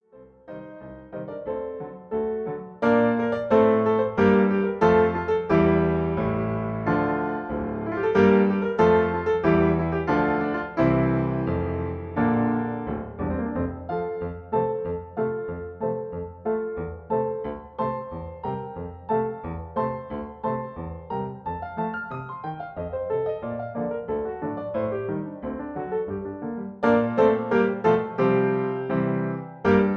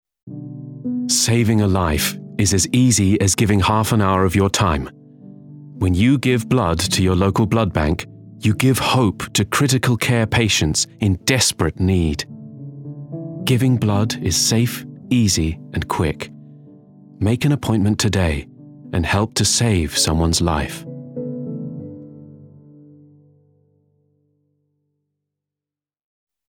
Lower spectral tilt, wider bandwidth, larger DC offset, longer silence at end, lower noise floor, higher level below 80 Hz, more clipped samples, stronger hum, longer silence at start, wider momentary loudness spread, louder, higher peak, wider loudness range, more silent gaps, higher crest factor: first, -9.5 dB/octave vs -4.5 dB/octave; second, 6.6 kHz vs 18 kHz; neither; second, 0 s vs 4.05 s; second, -49 dBFS vs -89 dBFS; second, -46 dBFS vs -36 dBFS; neither; neither; about the same, 0.15 s vs 0.25 s; about the same, 14 LU vs 16 LU; second, -25 LUFS vs -18 LUFS; second, -6 dBFS vs -2 dBFS; first, 9 LU vs 5 LU; neither; about the same, 18 dB vs 18 dB